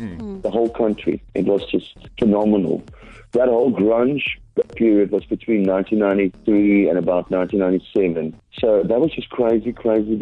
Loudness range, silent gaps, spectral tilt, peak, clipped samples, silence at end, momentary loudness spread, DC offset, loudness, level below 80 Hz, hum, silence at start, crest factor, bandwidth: 2 LU; none; -9 dB/octave; -6 dBFS; under 0.1%; 0 s; 8 LU; under 0.1%; -19 LUFS; -46 dBFS; none; 0 s; 12 dB; 5.2 kHz